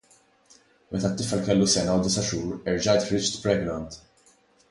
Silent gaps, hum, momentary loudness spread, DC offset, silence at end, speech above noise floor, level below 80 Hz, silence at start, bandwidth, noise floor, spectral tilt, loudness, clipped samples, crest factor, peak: none; none; 12 LU; under 0.1%; 0.7 s; 36 dB; -50 dBFS; 0.9 s; 11.5 kHz; -60 dBFS; -4.5 dB/octave; -25 LUFS; under 0.1%; 18 dB; -8 dBFS